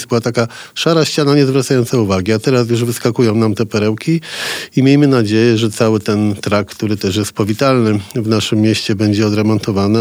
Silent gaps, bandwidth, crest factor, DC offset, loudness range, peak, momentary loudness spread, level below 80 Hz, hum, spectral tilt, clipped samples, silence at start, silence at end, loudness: none; over 20 kHz; 14 dB; under 0.1%; 1 LU; 0 dBFS; 6 LU; -54 dBFS; none; -6 dB/octave; under 0.1%; 0 s; 0 s; -14 LUFS